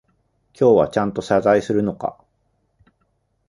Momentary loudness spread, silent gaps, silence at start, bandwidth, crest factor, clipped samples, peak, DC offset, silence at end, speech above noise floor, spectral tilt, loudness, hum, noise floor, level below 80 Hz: 11 LU; none; 0.6 s; 11.5 kHz; 18 dB; under 0.1%; -2 dBFS; under 0.1%; 1.35 s; 50 dB; -7 dB/octave; -19 LUFS; none; -67 dBFS; -54 dBFS